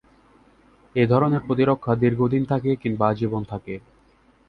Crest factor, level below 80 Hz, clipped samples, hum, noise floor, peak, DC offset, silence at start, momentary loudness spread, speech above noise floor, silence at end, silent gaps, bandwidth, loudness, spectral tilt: 18 dB; -52 dBFS; under 0.1%; none; -58 dBFS; -4 dBFS; under 0.1%; 0.95 s; 12 LU; 37 dB; 0.7 s; none; 5.4 kHz; -22 LUFS; -10 dB/octave